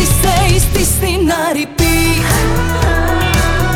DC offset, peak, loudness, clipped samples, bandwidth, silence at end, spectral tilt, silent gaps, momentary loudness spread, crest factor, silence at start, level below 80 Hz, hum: under 0.1%; -2 dBFS; -13 LUFS; under 0.1%; over 20 kHz; 0 s; -4 dB/octave; none; 3 LU; 10 dB; 0 s; -18 dBFS; none